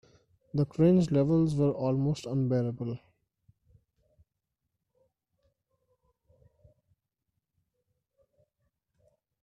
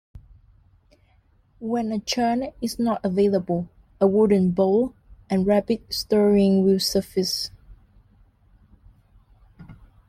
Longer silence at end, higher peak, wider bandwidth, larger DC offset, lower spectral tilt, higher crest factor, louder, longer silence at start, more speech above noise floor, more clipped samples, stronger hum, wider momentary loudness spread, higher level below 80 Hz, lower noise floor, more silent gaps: first, 6.45 s vs 0.35 s; second, -14 dBFS vs -6 dBFS; second, 10.5 kHz vs 15.5 kHz; neither; first, -9 dB/octave vs -6 dB/octave; about the same, 18 dB vs 18 dB; second, -28 LUFS vs -22 LUFS; first, 0.55 s vs 0.15 s; first, 58 dB vs 39 dB; neither; neither; first, 13 LU vs 10 LU; second, -60 dBFS vs -52 dBFS; first, -85 dBFS vs -60 dBFS; neither